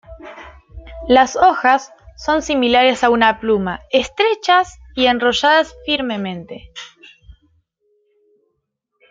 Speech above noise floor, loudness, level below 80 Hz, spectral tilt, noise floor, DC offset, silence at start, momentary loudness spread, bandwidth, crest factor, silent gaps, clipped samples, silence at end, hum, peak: 57 dB; -16 LUFS; -44 dBFS; -3.5 dB/octave; -73 dBFS; under 0.1%; 0.1 s; 21 LU; 7.8 kHz; 18 dB; none; under 0.1%; 2.25 s; none; 0 dBFS